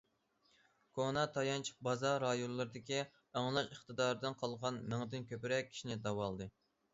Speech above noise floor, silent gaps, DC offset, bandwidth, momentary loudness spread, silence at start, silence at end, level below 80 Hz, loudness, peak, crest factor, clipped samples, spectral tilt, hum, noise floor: 38 dB; none; under 0.1%; 7.6 kHz; 7 LU; 0.95 s; 0.45 s; -72 dBFS; -40 LUFS; -20 dBFS; 20 dB; under 0.1%; -4 dB/octave; none; -77 dBFS